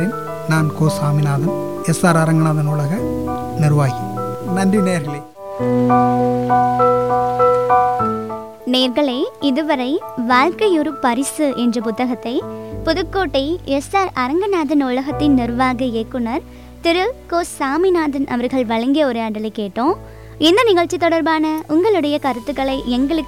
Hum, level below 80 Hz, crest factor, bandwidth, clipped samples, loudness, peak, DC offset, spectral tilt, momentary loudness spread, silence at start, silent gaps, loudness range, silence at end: none; -42 dBFS; 14 dB; 17 kHz; under 0.1%; -17 LUFS; -2 dBFS; 0.3%; -6 dB/octave; 9 LU; 0 s; none; 3 LU; 0 s